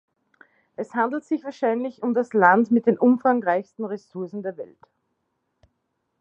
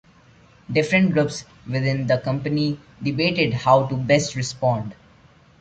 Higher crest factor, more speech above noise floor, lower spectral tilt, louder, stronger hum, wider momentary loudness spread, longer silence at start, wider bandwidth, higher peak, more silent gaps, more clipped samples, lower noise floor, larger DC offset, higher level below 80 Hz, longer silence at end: about the same, 22 dB vs 18 dB; first, 53 dB vs 32 dB; first, -8 dB/octave vs -5.5 dB/octave; about the same, -22 LUFS vs -21 LUFS; neither; first, 16 LU vs 10 LU; about the same, 0.8 s vs 0.7 s; second, 7.6 kHz vs 9.2 kHz; about the same, -2 dBFS vs -4 dBFS; neither; neither; first, -75 dBFS vs -52 dBFS; neither; second, -76 dBFS vs -54 dBFS; first, 1.55 s vs 0.65 s